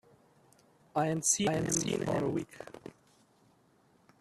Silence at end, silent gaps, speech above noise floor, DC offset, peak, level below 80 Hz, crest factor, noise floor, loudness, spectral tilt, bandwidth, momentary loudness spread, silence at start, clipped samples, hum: 1.3 s; none; 35 dB; under 0.1%; -14 dBFS; -64 dBFS; 20 dB; -67 dBFS; -31 LUFS; -4 dB/octave; 14.5 kHz; 20 LU; 0.95 s; under 0.1%; none